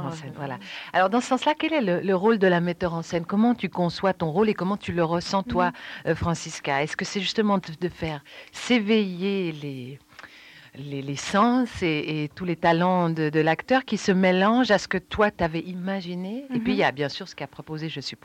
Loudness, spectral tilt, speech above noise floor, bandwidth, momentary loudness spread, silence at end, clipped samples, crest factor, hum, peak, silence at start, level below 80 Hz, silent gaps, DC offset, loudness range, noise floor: -24 LUFS; -5.5 dB/octave; 24 dB; 12 kHz; 14 LU; 0.1 s; under 0.1%; 16 dB; none; -8 dBFS; 0 s; -54 dBFS; none; under 0.1%; 5 LU; -49 dBFS